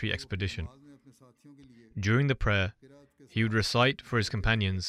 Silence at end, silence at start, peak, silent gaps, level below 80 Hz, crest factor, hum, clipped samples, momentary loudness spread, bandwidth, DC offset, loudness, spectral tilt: 0 s; 0 s; -12 dBFS; none; -44 dBFS; 18 dB; none; under 0.1%; 10 LU; 13.5 kHz; under 0.1%; -29 LUFS; -5.5 dB/octave